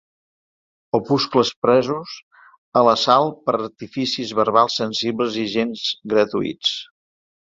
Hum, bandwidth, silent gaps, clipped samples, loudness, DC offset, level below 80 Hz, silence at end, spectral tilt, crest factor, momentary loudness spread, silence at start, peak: none; 7.8 kHz; 1.56-1.62 s, 2.23-2.31 s, 2.58-2.72 s; under 0.1%; -20 LUFS; under 0.1%; -62 dBFS; 0.75 s; -4.5 dB/octave; 20 dB; 9 LU; 0.95 s; -2 dBFS